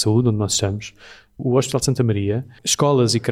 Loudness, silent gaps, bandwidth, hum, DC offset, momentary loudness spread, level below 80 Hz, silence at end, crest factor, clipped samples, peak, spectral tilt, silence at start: -19 LUFS; none; 15 kHz; none; under 0.1%; 9 LU; -50 dBFS; 0 s; 14 dB; under 0.1%; -6 dBFS; -5 dB/octave; 0 s